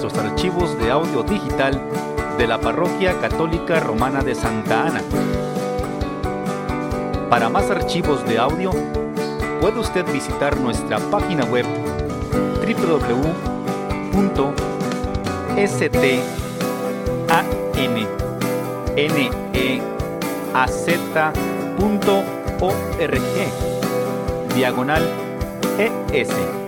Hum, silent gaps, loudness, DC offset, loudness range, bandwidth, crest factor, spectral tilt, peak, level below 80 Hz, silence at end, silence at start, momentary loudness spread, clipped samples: none; none; -20 LUFS; under 0.1%; 1 LU; 17 kHz; 18 dB; -5.5 dB/octave; -2 dBFS; -34 dBFS; 0 s; 0 s; 6 LU; under 0.1%